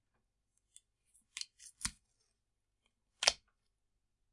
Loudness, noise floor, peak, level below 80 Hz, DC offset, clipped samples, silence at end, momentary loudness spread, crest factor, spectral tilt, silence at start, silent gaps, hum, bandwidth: -37 LUFS; -85 dBFS; -8 dBFS; -68 dBFS; under 0.1%; under 0.1%; 0.95 s; 17 LU; 36 dB; 1 dB/octave; 1.35 s; none; none; 11.5 kHz